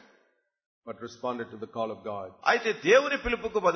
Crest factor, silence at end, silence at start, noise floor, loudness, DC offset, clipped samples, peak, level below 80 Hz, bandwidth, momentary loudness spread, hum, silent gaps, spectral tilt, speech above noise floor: 20 dB; 0 s; 0.85 s; -70 dBFS; -28 LUFS; under 0.1%; under 0.1%; -10 dBFS; -54 dBFS; 6.6 kHz; 17 LU; none; none; -4 dB/octave; 43 dB